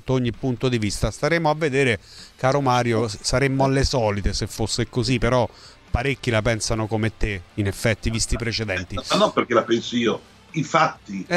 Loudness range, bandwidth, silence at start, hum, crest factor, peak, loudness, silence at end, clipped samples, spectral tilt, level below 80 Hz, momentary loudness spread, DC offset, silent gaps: 2 LU; 13.5 kHz; 0.05 s; none; 18 dB; -4 dBFS; -22 LUFS; 0 s; under 0.1%; -5 dB/octave; -34 dBFS; 7 LU; under 0.1%; none